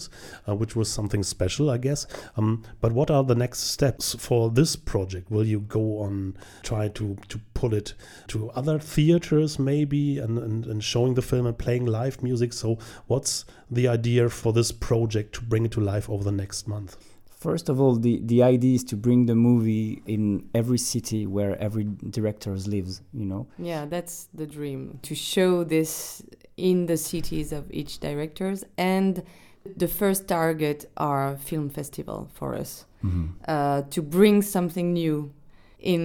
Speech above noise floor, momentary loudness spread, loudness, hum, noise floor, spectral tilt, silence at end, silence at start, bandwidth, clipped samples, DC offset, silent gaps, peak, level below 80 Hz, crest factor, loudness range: 20 dB; 12 LU; -25 LUFS; none; -44 dBFS; -6 dB/octave; 0 s; 0 s; 19 kHz; under 0.1%; under 0.1%; none; -4 dBFS; -46 dBFS; 20 dB; 6 LU